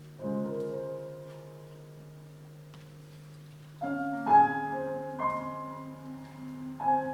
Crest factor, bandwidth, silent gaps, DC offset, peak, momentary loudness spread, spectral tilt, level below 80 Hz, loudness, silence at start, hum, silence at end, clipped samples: 22 dB; 15.5 kHz; none; under 0.1%; -12 dBFS; 24 LU; -7.5 dB/octave; -68 dBFS; -31 LUFS; 0 s; none; 0 s; under 0.1%